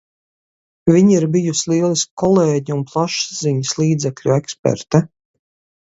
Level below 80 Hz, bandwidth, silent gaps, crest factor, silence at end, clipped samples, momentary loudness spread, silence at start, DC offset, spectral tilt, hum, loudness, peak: -54 dBFS; 8 kHz; 2.11-2.17 s, 4.59-4.63 s; 16 dB; 0.8 s; under 0.1%; 7 LU; 0.85 s; under 0.1%; -5.5 dB/octave; none; -17 LUFS; 0 dBFS